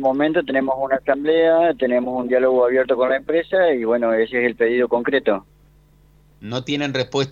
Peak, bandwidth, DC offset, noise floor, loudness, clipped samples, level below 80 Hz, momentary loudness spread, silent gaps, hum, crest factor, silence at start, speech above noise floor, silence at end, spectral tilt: -2 dBFS; 7.4 kHz; under 0.1%; -52 dBFS; -19 LUFS; under 0.1%; -54 dBFS; 7 LU; none; none; 16 dB; 0 s; 34 dB; 0 s; -6 dB/octave